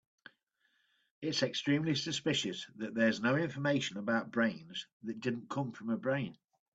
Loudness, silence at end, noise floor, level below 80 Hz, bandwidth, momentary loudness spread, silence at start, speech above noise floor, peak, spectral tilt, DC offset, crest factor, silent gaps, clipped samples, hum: -35 LUFS; 0.4 s; -77 dBFS; -76 dBFS; 8 kHz; 10 LU; 1.2 s; 43 dB; -18 dBFS; -5 dB/octave; under 0.1%; 18 dB; 4.93-5.00 s; under 0.1%; none